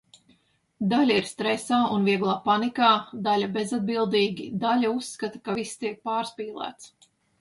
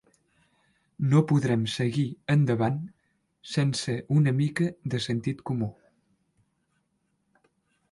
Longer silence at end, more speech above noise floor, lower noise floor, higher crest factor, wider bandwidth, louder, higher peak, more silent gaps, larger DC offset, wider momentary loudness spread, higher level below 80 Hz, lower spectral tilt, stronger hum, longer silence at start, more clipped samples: second, 0.55 s vs 2.2 s; second, 40 dB vs 49 dB; second, -65 dBFS vs -74 dBFS; about the same, 20 dB vs 18 dB; about the same, 11.5 kHz vs 11.5 kHz; about the same, -25 LUFS vs -27 LUFS; first, -6 dBFS vs -10 dBFS; neither; neither; first, 12 LU vs 8 LU; second, -68 dBFS vs -62 dBFS; second, -5 dB/octave vs -6.5 dB/octave; neither; second, 0.8 s vs 1 s; neither